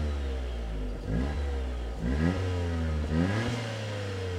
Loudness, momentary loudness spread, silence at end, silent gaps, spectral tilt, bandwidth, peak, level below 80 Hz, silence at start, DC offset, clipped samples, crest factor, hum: -32 LUFS; 7 LU; 0 s; none; -7 dB/octave; 11 kHz; -14 dBFS; -34 dBFS; 0 s; under 0.1%; under 0.1%; 16 dB; none